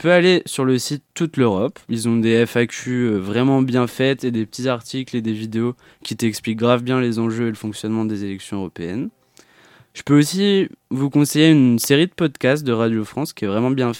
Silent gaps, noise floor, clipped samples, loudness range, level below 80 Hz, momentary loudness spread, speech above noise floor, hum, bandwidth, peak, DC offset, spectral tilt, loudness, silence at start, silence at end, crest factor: none; -52 dBFS; under 0.1%; 5 LU; -62 dBFS; 12 LU; 33 dB; none; 17.5 kHz; 0 dBFS; under 0.1%; -5.5 dB/octave; -19 LUFS; 0 s; 0 s; 18 dB